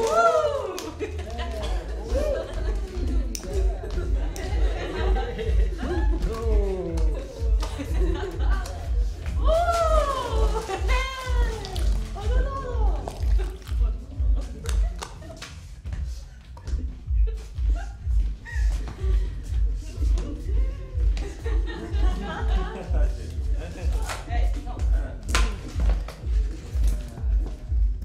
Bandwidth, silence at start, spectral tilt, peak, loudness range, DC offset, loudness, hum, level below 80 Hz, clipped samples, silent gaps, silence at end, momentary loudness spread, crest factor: 11.5 kHz; 0 s; -6 dB/octave; -4 dBFS; 5 LU; under 0.1%; -28 LUFS; none; -26 dBFS; under 0.1%; none; 0 s; 6 LU; 20 dB